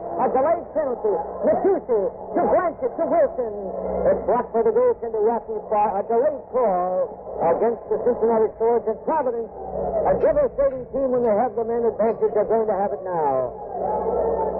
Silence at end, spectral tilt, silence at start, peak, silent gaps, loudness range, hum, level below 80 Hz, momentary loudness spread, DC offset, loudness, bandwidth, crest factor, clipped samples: 0 s; -9.5 dB/octave; 0 s; -10 dBFS; none; 1 LU; none; -48 dBFS; 6 LU; under 0.1%; -22 LUFS; 2.9 kHz; 12 dB; under 0.1%